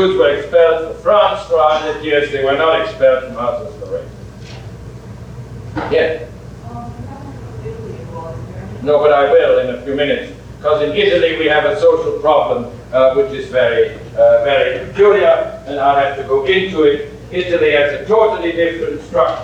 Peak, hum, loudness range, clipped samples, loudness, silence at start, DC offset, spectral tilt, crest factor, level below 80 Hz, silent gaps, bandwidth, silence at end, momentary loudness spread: 0 dBFS; none; 10 LU; under 0.1%; -14 LUFS; 0 s; under 0.1%; -6 dB/octave; 14 dB; -40 dBFS; none; 9 kHz; 0 s; 19 LU